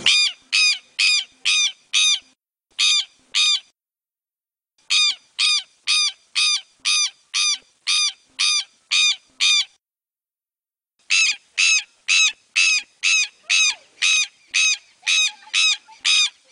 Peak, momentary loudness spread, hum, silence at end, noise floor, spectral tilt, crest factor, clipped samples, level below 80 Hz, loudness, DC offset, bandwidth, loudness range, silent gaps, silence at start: -4 dBFS; 5 LU; none; 0.2 s; under -90 dBFS; 5.5 dB/octave; 18 dB; under 0.1%; -78 dBFS; -18 LUFS; under 0.1%; 10.5 kHz; 3 LU; none; 0 s